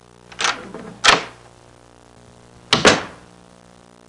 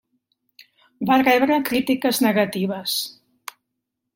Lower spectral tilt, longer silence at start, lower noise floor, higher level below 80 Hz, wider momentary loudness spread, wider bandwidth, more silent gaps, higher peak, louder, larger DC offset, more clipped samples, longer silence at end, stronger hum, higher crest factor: second, -2 dB/octave vs -4 dB/octave; second, 0.4 s vs 1 s; second, -48 dBFS vs -80 dBFS; first, -50 dBFS vs -64 dBFS; about the same, 22 LU vs 23 LU; second, 11.5 kHz vs 16.5 kHz; neither; first, 0 dBFS vs -4 dBFS; first, -16 LUFS vs -20 LUFS; neither; neither; about the same, 0.95 s vs 1.05 s; first, 60 Hz at -50 dBFS vs none; about the same, 22 dB vs 18 dB